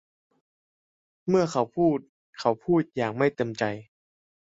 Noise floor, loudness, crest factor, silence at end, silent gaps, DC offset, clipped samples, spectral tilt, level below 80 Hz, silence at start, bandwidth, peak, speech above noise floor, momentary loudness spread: under -90 dBFS; -26 LUFS; 20 dB; 0.8 s; 2.09-2.33 s; under 0.1%; under 0.1%; -6.5 dB/octave; -64 dBFS; 1.25 s; 7.8 kHz; -8 dBFS; over 65 dB; 7 LU